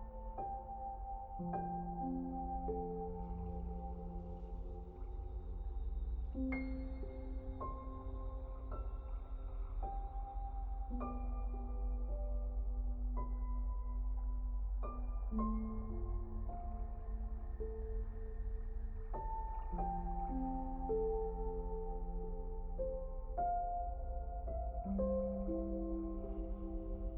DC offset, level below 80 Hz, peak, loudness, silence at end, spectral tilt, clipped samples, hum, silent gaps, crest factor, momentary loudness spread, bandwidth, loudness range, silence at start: under 0.1%; -42 dBFS; -26 dBFS; -44 LUFS; 0 s; -11.5 dB/octave; under 0.1%; none; none; 14 dB; 8 LU; 2.6 kHz; 5 LU; 0 s